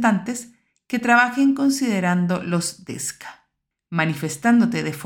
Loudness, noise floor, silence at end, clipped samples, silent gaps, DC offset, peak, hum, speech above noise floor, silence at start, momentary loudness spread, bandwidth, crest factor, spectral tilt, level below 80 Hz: -21 LUFS; -73 dBFS; 0 s; under 0.1%; none; under 0.1%; -4 dBFS; none; 53 dB; 0 s; 13 LU; 18 kHz; 18 dB; -5 dB/octave; -64 dBFS